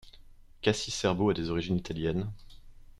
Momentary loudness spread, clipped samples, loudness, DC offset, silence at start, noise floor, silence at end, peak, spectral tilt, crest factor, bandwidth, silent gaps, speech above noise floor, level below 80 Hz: 8 LU; under 0.1%; -31 LUFS; under 0.1%; 0.05 s; -52 dBFS; 0.15 s; -12 dBFS; -5 dB/octave; 20 dB; 12.5 kHz; none; 23 dB; -50 dBFS